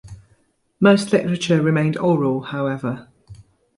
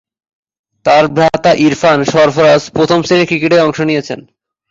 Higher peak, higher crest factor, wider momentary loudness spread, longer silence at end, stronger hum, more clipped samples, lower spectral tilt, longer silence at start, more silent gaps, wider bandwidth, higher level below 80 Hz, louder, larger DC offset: about the same, -2 dBFS vs 0 dBFS; first, 18 dB vs 12 dB; first, 10 LU vs 7 LU; second, 0.35 s vs 0.5 s; neither; neither; about the same, -6.5 dB/octave vs -5.5 dB/octave; second, 0.05 s vs 0.85 s; neither; first, 11.5 kHz vs 7.8 kHz; second, -56 dBFS vs -48 dBFS; second, -19 LUFS vs -10 LUFS; neither